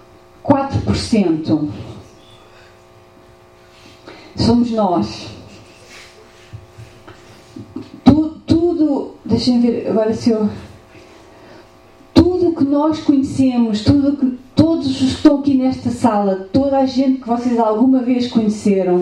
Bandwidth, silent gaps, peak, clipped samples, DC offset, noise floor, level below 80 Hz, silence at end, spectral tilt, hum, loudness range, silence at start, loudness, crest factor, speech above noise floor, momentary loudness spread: 10.5 kHz; none; 0 dBFS; under 0.1%; under 0.1%; -45 dBFS; -42 dBFS; 0 s; -7 dB/octave; none; 7 LU; 0.45 s; -16 LUFS; 16 dB; 30 dB; 9 LU